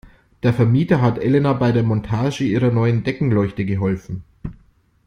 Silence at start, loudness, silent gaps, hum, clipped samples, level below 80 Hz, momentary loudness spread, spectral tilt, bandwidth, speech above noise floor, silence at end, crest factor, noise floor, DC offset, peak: 0.05 s; -18 LUFS; none; none; under 0.1%; -44 dBFS; 14 LU; -8.5 dB/octave; 7.2 kHz; 37 dB; 0.55 s; 16 dB; -54 dBFS; under 0.1%; -2 dBFS